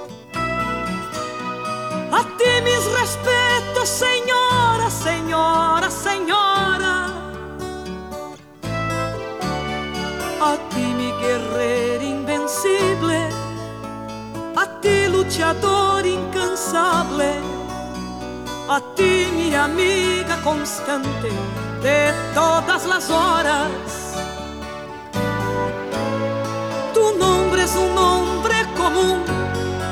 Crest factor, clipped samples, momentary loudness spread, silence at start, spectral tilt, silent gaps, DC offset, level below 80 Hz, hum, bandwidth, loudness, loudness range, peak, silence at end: 16 dB; under 0.1%; 13 LU; 0 s; -4 dB/octave; none; 0.1%; -40 dBFS; none; 18.5 kHz; -20 LUFS; 5 LU; -4 dBFS; 0 s